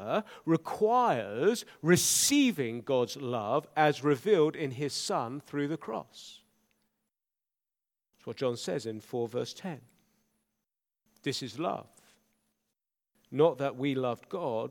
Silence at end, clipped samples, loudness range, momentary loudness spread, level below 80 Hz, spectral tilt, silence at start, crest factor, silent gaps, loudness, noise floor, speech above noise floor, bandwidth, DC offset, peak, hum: 0 s; under 0.1%; 13 LU; 14 LU; -74 dBFS; -4 dB/octave; 0 s; 22 dB; none; -30 LUFS; under -90 dBFS; over 60 dB; 19 kHz; under 0.1%; -10 dBFS; none